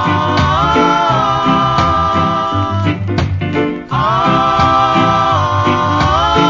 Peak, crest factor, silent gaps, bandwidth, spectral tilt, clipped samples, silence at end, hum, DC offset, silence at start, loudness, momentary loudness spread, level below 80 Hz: 0 dBFS; 12 dB; none; 7.6 kHz; -6 dB/octave; under 0.1%; 0 s; none; under 0.1%; 0 s; -12 LUFS; 6 LU; -28 dBFS